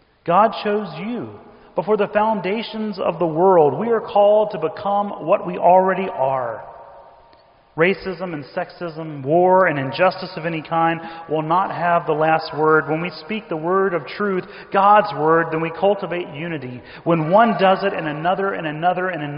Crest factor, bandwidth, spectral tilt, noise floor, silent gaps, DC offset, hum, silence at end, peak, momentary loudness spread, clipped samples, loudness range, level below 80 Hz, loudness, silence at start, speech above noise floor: 16 dB; 5.4 kHz; -4.5 dB/octave; -52 dBFS; none; under 0.1%; none; 0 s; -2 dBFS; 13 LU; under 0.1%; 3 LU; -60 dBFS; -19 LUFS; 0.25 s; 33 dB